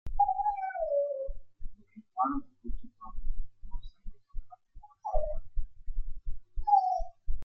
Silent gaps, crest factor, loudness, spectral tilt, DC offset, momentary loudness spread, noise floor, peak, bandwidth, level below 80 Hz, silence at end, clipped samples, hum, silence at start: none; 16 dB; -33 LUFS; -8.5 dB/octave; under 0.1%; 24 LU; -52 dBFS; -14 dBFS; 5.6 kHz; -38 dBFS; 0 s; under 0.1%; none; 0.05 s